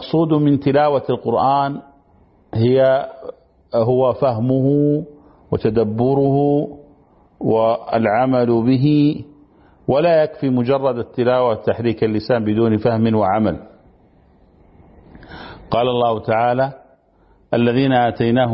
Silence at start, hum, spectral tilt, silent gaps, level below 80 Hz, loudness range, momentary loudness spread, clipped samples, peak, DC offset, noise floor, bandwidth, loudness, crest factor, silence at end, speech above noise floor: 0 s; none; -12.5 dB/octave; none; -50 dBFS; 5 LU; 9 LU; under 0.1%; -4 dBFS; under 0.1%; -54 dBFS; 5.8 kHz; -17 LUFS; 14 dB; 0 s; 38 dB